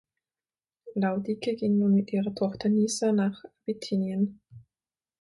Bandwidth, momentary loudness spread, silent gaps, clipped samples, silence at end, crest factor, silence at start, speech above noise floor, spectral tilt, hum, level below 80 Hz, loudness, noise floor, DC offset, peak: 11.5 kHz; 9 LU; none; under 0.1%; 0.6 s; 14 dB; 0.85 s; over 63 dB; -6 dB/octave; none; -68 dBFS; -28 LUFS; under -90 dBFS; under 0.1%; -14 dBFS